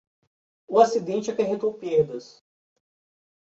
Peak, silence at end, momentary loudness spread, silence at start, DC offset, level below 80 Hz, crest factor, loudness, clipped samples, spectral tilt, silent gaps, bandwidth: -4 dBFS; 1.2 s; 8 LU; 0.7 s; under 0.1%; -70 dBFS; 22 dB; -24 LUFS; under 0.1%; -5.5 dB/octave; none; 7.8 kHz